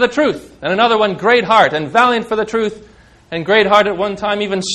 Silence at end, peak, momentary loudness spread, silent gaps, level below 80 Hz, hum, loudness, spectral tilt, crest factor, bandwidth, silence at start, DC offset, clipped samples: 0 s; 0 dBFS; 9 LU; none; -50 dBFS; none; -14 LUFS; -4 dB/octave; 14 dB; 11.5 kHz; 0 s; under 0.1%; 0.1%